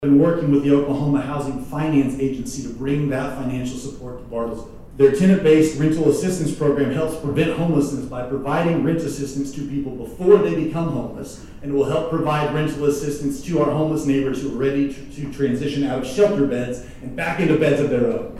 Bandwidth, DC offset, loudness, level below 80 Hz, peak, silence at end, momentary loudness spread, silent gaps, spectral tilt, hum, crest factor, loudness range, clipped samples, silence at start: 13.5 kHz; under 0.1%; -20 LUFS; -42 dBFS; -2 dBFS; 0 s; 13 LU; none; -7 dB/octave; none; 18 dB; 4 LU; under 0.1%; 0 s